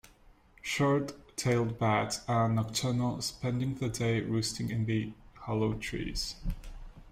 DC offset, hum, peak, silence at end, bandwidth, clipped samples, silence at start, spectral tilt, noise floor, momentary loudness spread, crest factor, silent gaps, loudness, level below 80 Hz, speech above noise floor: under 0.1%; none; -16 dBFS; 0 s; 16 kHz; under 0.1%; 0.65 s; -5 dB/octave; -60 dBFS; 12 LU; 16 dB; none; -32 LUFS; -48 dBFS; 29 dB